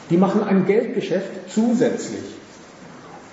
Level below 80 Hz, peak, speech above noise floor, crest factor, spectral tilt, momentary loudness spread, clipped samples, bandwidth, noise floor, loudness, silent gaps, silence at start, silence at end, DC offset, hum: -66 dBFS; -6 dBFS; 22 dB; 14 dB; -7 dB/octave; 23 LU; under 0.1%; 8 kHz; -42 dBFS; -20 LUFS; none; 0 s; 0 s; under 0.1%; none